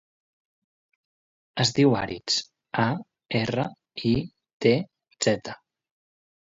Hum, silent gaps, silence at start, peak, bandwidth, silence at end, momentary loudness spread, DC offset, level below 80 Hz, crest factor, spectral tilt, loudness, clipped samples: none; 4.53-4.60 s; 1.55 s; -6 dBFS; 8 kHz; 0.95 s; 14 LU; under 0.1%; -56 dBFS; 20 dB; -5 dB/octave; -26 LUFS; under 0.1%